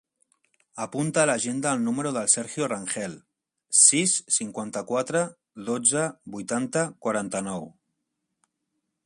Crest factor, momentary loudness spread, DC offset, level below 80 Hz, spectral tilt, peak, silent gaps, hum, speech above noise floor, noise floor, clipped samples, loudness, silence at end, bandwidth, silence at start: 24 dB; 15 LU; under 0.1%; -70 dBFS; -3 dB/octave; -2 dBFS; none; none; 55 dB; -80 dBFS; under 0.1%; -24 LUFS; 1.35 s; 11.5 kHz; 0.75 s